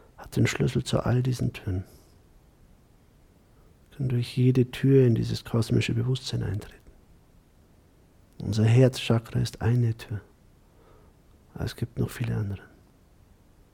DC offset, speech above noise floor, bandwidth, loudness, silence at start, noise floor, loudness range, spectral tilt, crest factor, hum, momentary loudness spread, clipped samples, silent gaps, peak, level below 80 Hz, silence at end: under 0.1%; 33 dB; 14.5 kHz; -26 LUFS; 0.2 s; -58 dBFS; 9 LU; -7 dB/octave; 18 dB; none; 15 LU; under 0.1%; none; -8 dBFS; -50 dBFS; 1.15 s